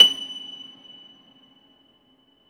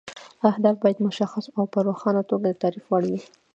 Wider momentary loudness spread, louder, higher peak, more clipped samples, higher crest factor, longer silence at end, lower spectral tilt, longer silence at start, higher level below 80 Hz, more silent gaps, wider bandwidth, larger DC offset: first, 23 LU vs 7 LU; first, -21 LUFS vs -24 LUFS; first, 0 dBFS vs -4 dBFS; neither; about the same, 24 dB vs 20 dB; first, 2.1 s vs 0.3 s; second, 0.5 dB/octave vs -7.5 dB/octave; about the same, 0 s vs 0.05 s; about the same, -76 dBFS vs -72 dBFS; neither; first, 20 kHz vs 8 kHz; neither